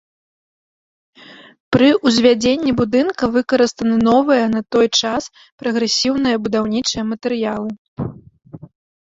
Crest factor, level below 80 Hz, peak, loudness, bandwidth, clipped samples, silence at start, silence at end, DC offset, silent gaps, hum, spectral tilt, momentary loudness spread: 16 dB; -50 dBFS; -2 dBFS; -16 LUFS; 7.8 kHz; under 0.1%; 1.3 s; 0.45 s; under 0.1%; 1.60-1.71 s, 5.52-5.58 s, 7.79-7.96 s; none; -4.5 dB/octave; 13 LU